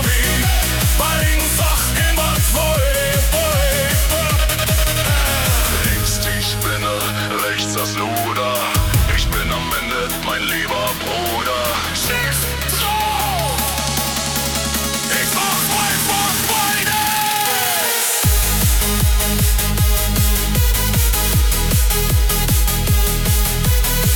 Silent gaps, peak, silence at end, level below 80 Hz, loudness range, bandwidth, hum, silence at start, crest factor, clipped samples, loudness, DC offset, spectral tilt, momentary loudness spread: none; -2 dBFS; 0 s; -22 dBFS; 3 LU; 19 kHz; none; 0 s; 14 dB; under 0.1%; -16 LUFS; under 0.1%; -3 dB/octave; 4 LU